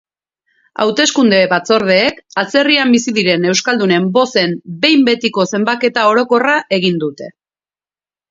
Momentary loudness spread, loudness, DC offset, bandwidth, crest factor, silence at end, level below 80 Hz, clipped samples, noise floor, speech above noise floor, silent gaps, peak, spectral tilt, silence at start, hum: 7 LU; -13 LUFS; under 0.1%; 7.8 kHz; 14 dB; 1 s; -60 dBFS; under 0.1%; under -90 dBFS; over 77 dB; none; 0 dBFS; -4 dB/octave; 0.8 s; none